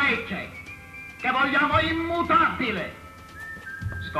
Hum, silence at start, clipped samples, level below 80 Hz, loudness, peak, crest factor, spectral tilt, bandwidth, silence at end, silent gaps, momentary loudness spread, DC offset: none; 0 s; under 0.1%; -48 dBFS; -24 LUFS; -8 dBFS; 18 dB; -5.5 dB/octave; 14 kHz; 0 s; none; 19 LU; under 0.1%